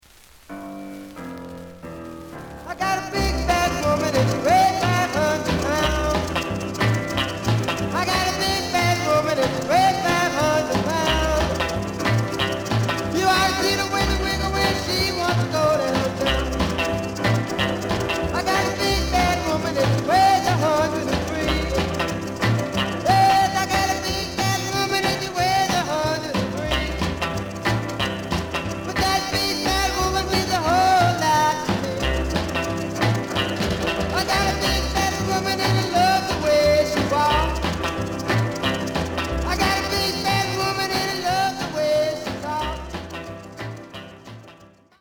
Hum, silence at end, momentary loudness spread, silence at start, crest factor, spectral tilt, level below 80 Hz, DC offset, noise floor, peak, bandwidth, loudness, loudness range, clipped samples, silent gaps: none; 0.35 s; 9 LU; 0.5 s; 16 dB; -4.5 dB/octave; -34 dBFS; under 0.1%; -49 dBFS; -6 dBFS; over 20 kHz; -21 LUFS; 3 LU; under 0.1%; none